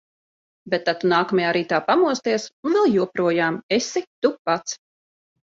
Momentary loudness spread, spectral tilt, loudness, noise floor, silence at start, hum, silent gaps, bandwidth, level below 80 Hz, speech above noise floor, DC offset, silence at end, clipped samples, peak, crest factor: 7 LU; -4.5 dB/octave; -21 LUFS; under -90 dBFS; 0.65 s; none; 2.53-2.63 s, 3.63-3.69 s, 4.07-4.22 s, 4.39-4.45 s; 7.8 kHz; -66 dBFS; over 69 dB; under 0.1%; 0.7 s; under 0.1%; -4 dBFS; 18 dB